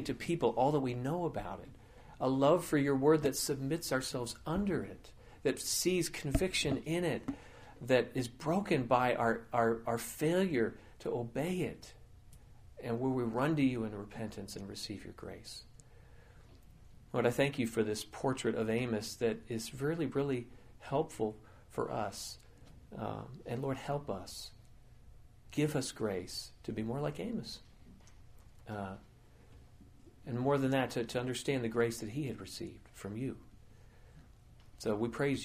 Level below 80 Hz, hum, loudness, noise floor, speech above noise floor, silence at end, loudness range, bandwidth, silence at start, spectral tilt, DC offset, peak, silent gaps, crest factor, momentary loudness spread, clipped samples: -56 dBFS; none; -35 LUFS; -59 dBFS; 24 dB; 0 s; 9 LU; 15.5 kHz; 0 s; -5 dB/octave; under 0.1%; -14 dBFS; none; 22 dB; 15 LU; under 0.1%